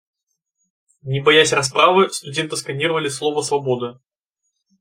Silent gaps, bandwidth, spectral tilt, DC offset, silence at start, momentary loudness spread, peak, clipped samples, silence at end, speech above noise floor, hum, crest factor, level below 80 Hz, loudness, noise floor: none; 16 kHz; -3.5 dB/octave; under 0.1%; 1.05 s; 11 LU; -2 dBFS; under 0.1%; 0.9 s; 58 dB; none; 18 dB; -64 dBFS; -18 LUFS; -76 dBFS